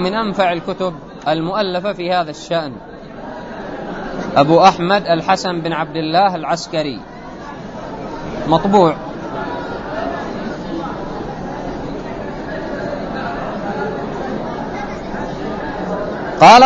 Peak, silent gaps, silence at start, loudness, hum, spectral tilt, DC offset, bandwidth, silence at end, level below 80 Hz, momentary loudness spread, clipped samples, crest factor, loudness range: 0 dBFS; none; 0 s; -18 LUFS; none; -5.5 dB/octave; under 0.1%; 11 kHz; 0 s; -40 dBFS; 16 LU; under 0.1%; 18 dB; 9 LU